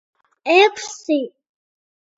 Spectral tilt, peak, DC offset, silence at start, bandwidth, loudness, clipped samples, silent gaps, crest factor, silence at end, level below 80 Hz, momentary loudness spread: -1 dB/octave; -2 dBFS; under 0.1%; 0.45 s; 8 kHz; -17 LUFS; under 0.1%; none; 18 dB; 0.9 s; -78 dBFS; 16 LU